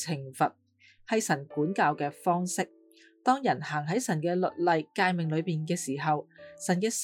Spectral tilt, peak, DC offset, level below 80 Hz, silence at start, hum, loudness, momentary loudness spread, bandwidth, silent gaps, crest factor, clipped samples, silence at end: -5 dB/octave; -12 dBFS; under 0.1%; -82 dBFS; 0 s; none; -29 LUFS; 5 LU; 18 kHz; none; 18 dB; under 0.1%; 0 s